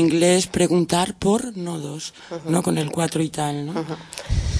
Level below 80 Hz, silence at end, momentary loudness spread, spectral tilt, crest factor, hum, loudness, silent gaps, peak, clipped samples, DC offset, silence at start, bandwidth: -36 dBFS; 0 s; 13 LU; -5 dB/octave; 16 dB; none; -22 LUFS; none; -4 dBFS; under 0.1%; under 0.1%; 0 s; 11 kHz